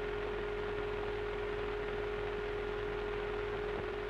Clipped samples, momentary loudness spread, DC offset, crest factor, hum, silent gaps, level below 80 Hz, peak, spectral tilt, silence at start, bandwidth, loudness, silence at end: under 0.1%; 0 LU; under 0.1%; 14 dB; none; none; -48 dBFS; -24 dBFS; -6.5 dB/octave; 0 s; 9 kHz; -38 LUFS; 0 s